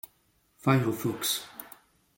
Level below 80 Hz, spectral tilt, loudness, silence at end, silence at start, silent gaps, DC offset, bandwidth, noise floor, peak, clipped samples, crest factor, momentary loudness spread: -66 dBFS; -4.5 dB/octave; -28 LUFS; 0.5 s; 0.65 s; none; under 0.1%; 17 kHz; -69 dBFS; -10 dBFS; under 0.1%; 22 dB; 21 LU